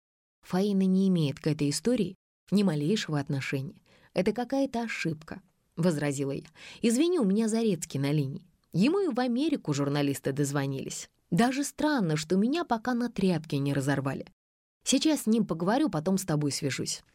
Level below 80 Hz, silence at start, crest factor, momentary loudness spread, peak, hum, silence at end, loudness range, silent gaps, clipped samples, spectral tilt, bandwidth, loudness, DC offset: -64 dBFS; 0.5 s; 16 dB; 10 LU; -12 dBFS; none; 0.15 s; 3 LU; 2.15-2.47 s, 14.33-14.81 s; under 0.1%; -5.5 dB/octave; 16 kHz; -28 LUFS; under 0.1%